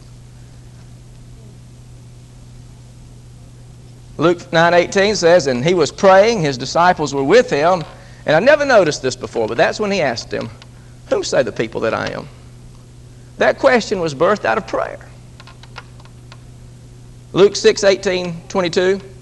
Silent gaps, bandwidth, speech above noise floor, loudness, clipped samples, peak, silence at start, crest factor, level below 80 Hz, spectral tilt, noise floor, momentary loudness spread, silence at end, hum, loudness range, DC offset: none; 11.5 kHz; 24 dB; -15 LUFS; under 0.1%; 0 dBFS; 0.05 s; 18 dB; -44 dBFS; -4.5 dB/octave; -39 dBFS; 14 LU; 0.05 s; none; 9 LU; under 0.1%